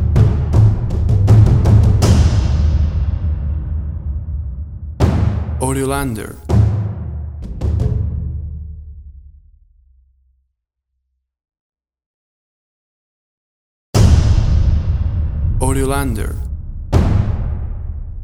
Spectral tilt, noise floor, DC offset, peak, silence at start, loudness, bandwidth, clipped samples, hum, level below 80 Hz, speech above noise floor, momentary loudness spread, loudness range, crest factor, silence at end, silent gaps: -7 dB/octave; -74 dBFS; under 0.1%; 0 dBFS; 0 s; -16 LUFS; 13.5 kHz; under 0.1%; none; -20 dBFS; 55 dB; 16 LU; 11 LU; 14 dB; 0 s; 11.60-11.70 s, 12.06-13.93 s